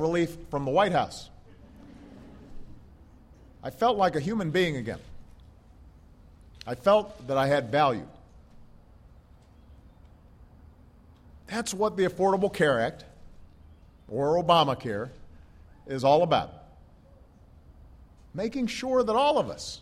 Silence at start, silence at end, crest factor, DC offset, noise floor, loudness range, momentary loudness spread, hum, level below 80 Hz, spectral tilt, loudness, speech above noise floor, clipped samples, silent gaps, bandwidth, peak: 0 s; 0 s; 22 dB; under 0.1%; -54 dBFS; 6 LU; 19 LU; none; -54 dBFS; -5.5 dB/octave; -26 LUFS; 29 dB; under 0.1%; none; 15.5 kHz; -8 dBFS